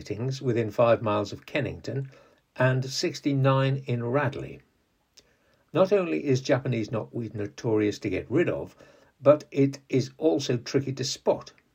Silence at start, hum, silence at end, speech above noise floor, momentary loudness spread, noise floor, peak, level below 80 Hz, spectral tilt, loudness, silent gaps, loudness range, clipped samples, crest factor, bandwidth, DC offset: 0 s; none; 0.3 s; 41 dB; 11 LU; -67 dBFS; -6 dBFS; -64 dBFS; -6 dB/octave; -27 LUFS; none; 2 LU; under 0.1%; 22 dB; 15 kHz; under 0.1%